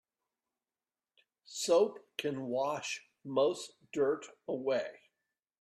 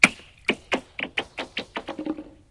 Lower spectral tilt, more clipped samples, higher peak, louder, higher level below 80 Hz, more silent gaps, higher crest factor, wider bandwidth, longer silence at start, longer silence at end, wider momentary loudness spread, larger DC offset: about the same, -3.5 dB/octave vs -2.5 dB/octave; neither; second, -18 dBFS vs 0 dBFS; second, -34 LUFS vs -28 LUFS; second, -82 dBFS vs -58 dBFS; neither; second, 18 dB vs 28 dB; first, 14.5 kHz vs 12 kHz; first, 1.5 s vs 0 s; first, 0.65 s vs 0.2 s; first, 13 LU vs 8 LU; neither